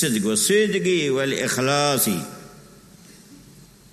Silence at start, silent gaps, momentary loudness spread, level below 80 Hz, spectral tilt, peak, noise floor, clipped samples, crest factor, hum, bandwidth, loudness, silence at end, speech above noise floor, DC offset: 0 s; none; 9 LU; -60 dBFS; -3.5 dB/octave; -6 dBFS; -48 dBFS; under 0.1%; 16 dB; none; 13.5 kHz; -20 LUFS; 0.55 s; 27 dB; under 0.1%